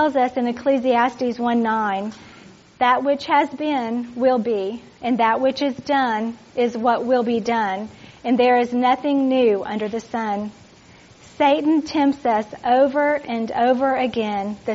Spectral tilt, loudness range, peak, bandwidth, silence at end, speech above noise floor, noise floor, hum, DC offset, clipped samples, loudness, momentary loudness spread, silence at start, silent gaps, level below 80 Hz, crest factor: -3 dB/octave; 2 LU; -4 dBFS; 7.6 kHz; 0 s; 28 dB; -48 dBFS; none; under 0.1%; under 0.1%; -20 LUFS; 8 LU; 0 s; none; -60 dBFS; 16 dB